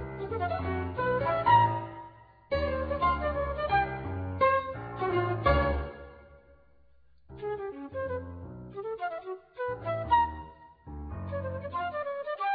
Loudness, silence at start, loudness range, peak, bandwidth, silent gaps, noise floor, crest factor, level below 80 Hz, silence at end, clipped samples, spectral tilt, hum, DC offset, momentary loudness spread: -30 LUFS; 0 s; 10 LU; -12 dBFS; 5 kHz; none; -66 dBFS; 20 dB; -44 dBFS; 0 s; under 0.1%; -9.5 dB/octave; none; under 0.1%; 17 LU